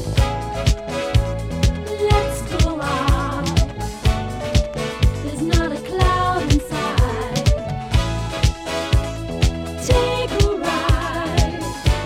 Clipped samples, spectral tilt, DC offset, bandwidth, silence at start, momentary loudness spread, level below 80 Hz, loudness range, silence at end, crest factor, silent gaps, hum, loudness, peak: under 0.1%; -5.5 dB/octave; under 0.1%; 15.5 kHz; 0 s; 5 LU; -24 dBFS; 1 LU; 0 s; 16 dB; none; none; -20 LUFS; -2 dBFS